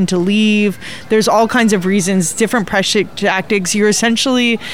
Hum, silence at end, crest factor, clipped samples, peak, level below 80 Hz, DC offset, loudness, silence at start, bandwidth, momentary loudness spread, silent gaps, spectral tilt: none; 0 s; 12 dB; under 0.1%; -2 dBFS; -50 dBFS; 1%; -13 LUFS; 0 s; 16.5 kHz; 4 LU; none; -4 dB/octave